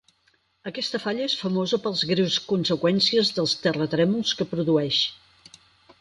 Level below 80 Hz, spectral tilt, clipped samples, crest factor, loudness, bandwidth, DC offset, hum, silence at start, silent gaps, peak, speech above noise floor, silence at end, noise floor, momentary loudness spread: -64 dBFS; -5 dB/octave; under 0.1%; 16 dB; -23 LUFS; 11.5 kHz; under 0.1%; none; 0.65 s; none; -8 dBFS; 43 dB; 0.85 s; -66 dBFS; 7 LU